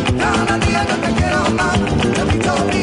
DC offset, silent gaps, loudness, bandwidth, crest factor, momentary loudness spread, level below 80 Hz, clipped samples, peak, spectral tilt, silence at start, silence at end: under 0.1%; none; -16 LUFS; 10.5 kHz; 12 dB; 1 LU; -28 dBFS; under 0.1%; -4 dBFS; -5 dB/octave; 0 s; 0 s